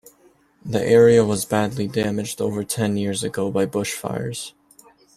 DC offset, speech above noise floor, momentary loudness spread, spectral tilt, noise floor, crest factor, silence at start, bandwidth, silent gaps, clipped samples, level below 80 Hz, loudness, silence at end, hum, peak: under 0.1%; 36 dB; 13 LU; -5 dB/octave; -57 dBFS; 18 dB; 0.65 s; 14.5 kHz; none; under 0.1%; -56 dBFS; -21 LUFS; 0.7 s; none; -4 dBFS